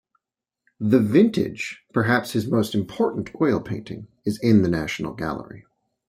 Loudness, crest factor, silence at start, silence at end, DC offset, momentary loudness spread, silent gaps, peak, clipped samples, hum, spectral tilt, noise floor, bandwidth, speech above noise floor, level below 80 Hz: -22 LUFS; 18 dB; 0.8 s; 0.45 s; under 0.1%; 14 LU; none; -4 dBFS; under 0.1%; none; -7 dB/octave; -86 dBFS; 15.5 kHz; 64 dB; -54 dBFS